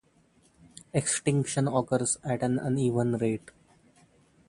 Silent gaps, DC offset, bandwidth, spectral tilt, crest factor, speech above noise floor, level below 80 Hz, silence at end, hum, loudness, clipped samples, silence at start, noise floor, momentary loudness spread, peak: none; under 0.1%; 11.5 kHz; -5.5 dB/octave; 20 dB; 36 dB; -62 dBFS; 1.1 s; none; -28 LUFS; under 0.1%; 0.95 s; -64 dBFS; 4 LU; -10 dBFS